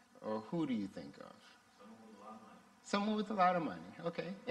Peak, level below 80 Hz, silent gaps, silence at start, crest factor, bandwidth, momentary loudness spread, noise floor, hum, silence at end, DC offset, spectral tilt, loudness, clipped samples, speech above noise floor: -20 dBFS; -80 dBFS; none; 0.15 s; 22 dB; 11.5 kHz; 24 LU; -60 dBFS; none; 0 s; under 0.1%; -6 dB/octave; -38 LUFS; under 0.1%; 22 dB